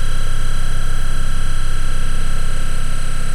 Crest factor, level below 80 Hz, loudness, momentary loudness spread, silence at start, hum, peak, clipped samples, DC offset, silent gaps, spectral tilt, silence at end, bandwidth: 6 dB; -14 dBFS; -24 LUFS; 1 LU; 0 s; none; -6 dBFS; under 0.1%; under 0.1%; none; -4 dB/octave; 0 s; 10.5 kHz